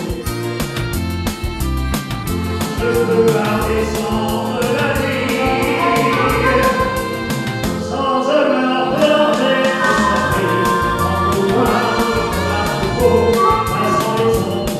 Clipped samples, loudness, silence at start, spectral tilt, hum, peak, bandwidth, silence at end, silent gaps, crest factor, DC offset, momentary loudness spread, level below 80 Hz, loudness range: under 0.1%; -16 LUFS; 0 s; -5 dB/octave; none; 0 dBFS; 16 kHz; 0 s; none; 16 dB; under 0.1%; 7 LU; -30 dBFS; 3 LU